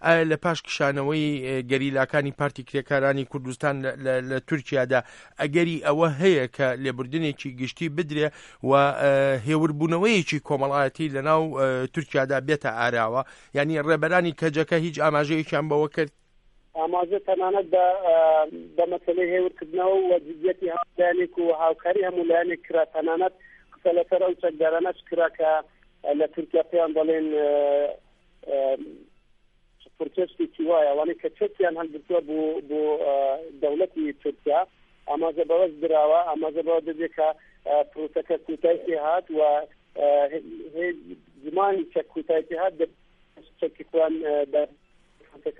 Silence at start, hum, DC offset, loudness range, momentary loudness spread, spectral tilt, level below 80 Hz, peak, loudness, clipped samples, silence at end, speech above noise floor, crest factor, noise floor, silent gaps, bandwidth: 0 s; none; under 0.1%; 4 LU; 9 LU; -6.5 dB/octave; -62 dBFS; -4 dBFS; -24 LUFS; under 0.1%; 0.1 s; 37 dB; 20 dB; -61 dBFS; none; 11 kHz